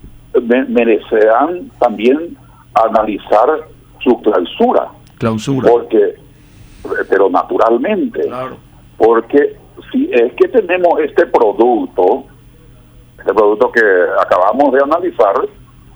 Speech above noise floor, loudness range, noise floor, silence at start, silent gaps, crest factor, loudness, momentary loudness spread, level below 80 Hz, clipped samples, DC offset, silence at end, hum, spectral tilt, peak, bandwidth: 29 dB; 2 LU; -41 dBFS; 0.05 s; none; 12 dB; -13 LUFS; 9 LU; -46 dBFS; under 0.1%; under 0.1%; 0.45 s; none; -6.5 dB/octave; 0 dBFS; over 20 kHz